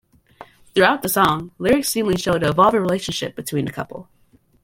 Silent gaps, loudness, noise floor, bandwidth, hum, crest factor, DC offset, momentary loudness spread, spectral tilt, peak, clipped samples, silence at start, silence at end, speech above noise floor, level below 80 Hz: none; -19 LUFS; -45 dBFS; 17 kHz; none; 18 dB; under 0.1%; 11 LU; -4.5 dB/octave; -2 dBFS; under 0.1%; 0.4 s; 0.6 s; 26 dB; -50 dBFS